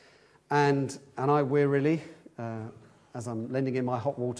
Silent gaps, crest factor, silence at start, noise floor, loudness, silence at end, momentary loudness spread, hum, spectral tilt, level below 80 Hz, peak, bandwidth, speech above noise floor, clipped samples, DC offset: none; 18 dB; 0.5 s; -60 dBFS; -29 LUFS; 0 s; 16 LU; none; -7 dB/octave; -72 dBFS; -12 dBFS; 11 kHz; 31 dB; under 0.1%; under 0.1%